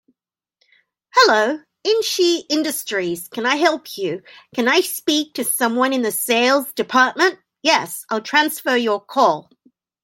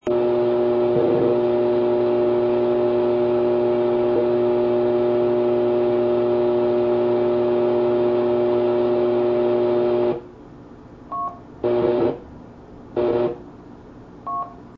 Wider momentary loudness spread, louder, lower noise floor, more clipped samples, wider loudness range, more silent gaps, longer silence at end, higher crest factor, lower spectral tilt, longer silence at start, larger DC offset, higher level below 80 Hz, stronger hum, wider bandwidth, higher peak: about the same, 10 LU vs 10 LU; about the same, -18 LUFS vs -20 LUFS; first, -79 dBFS vs -42 dBFS; neither; second, 2 LU vs 6 LU; neither; first, 0.65 s vs 0.05 s; about the same, 18 dB vs 14 dB; second, -2 dB/octave vs -9.5 dB/octave; first, 1.15 s vs 0.05 s; neither; second, -72 dBFS vs -52 dBFS; neither; first, 17 kHz vs 5.2 kHz; first, -2 dBFS vs -6 dBFS